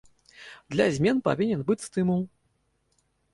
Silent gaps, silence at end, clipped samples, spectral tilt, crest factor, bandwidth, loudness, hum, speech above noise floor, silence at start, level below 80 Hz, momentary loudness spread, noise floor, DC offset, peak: none; 1.05 s; under 0.1%; -6.5 dB/octave; 18 dB; 11.5 kHz; -26 LUFS; none; 47 dB; 0.4 s; -60 dBFS; 22 LU; -72 dBFS; under 0.1%; -10 dBFS